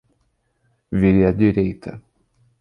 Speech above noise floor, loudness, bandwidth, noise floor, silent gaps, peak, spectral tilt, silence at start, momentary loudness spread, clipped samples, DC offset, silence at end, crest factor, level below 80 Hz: 50 dB; -18 LUFS; 5.2 kHz; -67 dBFS; none; -4 dBFS; -10.5 dB/octave; 0.9 s; 17 LU; under 0.1%; under 0.1%; 0.6 s; 18 dB; -40 dBFS